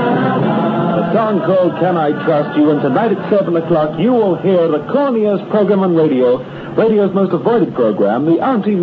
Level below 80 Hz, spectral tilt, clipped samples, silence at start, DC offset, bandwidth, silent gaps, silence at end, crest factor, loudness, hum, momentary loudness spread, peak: -54 dBFS; -10 dB/octave; under 0.1%; 0 s; under 0.1%; 5.2 kHz; none; 0 s; 12 dB; -14 LUFS; none; 3 LU; 0 dBFS